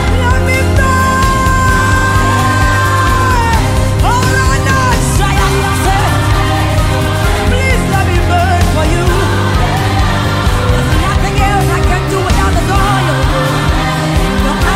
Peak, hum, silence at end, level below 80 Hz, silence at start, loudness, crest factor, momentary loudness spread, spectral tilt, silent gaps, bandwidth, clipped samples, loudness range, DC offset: 0 dBFS; none; 0 s; -16 dBFS; 0 s; -11 LUFS; 10 dB; 2 LU; -5 dB/octave; none; 16 kHz; under 0.1%; 2 LU; under 0.1%